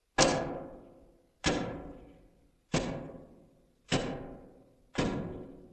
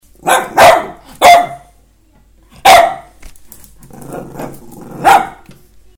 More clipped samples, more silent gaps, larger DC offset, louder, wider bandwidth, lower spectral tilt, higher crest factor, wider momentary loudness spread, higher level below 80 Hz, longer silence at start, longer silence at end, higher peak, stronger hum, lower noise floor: second, under 0.1% vs 0.4%; neither; neither; second, -34 LUFS vs -9 LUFS; second, 12 kHz vs 19 kHz; first, -4 dB/octave vs -2 dB/octave; first, 28 dB vs 12 dB; about the same, 22 LU vs 22 LU; second, -52 dBFS vs -42 dBFS; about the same, 0.2 s vs 0.25 s; second, 0.05 s vs 0.7 s; second, -8 dBFS vs 0 dBFS; neither; first, -64 dBFS vs -48 dBFS